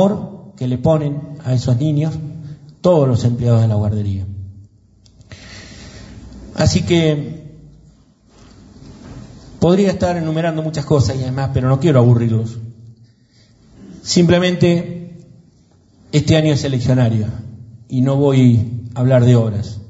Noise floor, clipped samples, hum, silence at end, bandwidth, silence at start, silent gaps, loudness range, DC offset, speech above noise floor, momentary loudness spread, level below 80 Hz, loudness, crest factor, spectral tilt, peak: -51 dBFS; under 0.1%; none; 0 s; 8 kHz; 0 s; none; 5 LU; under 0.1%; 37 dB; 23 LU; -42 dBFS; -16 LUFS; 16 dB; -7 dB/octave; 0 dBFS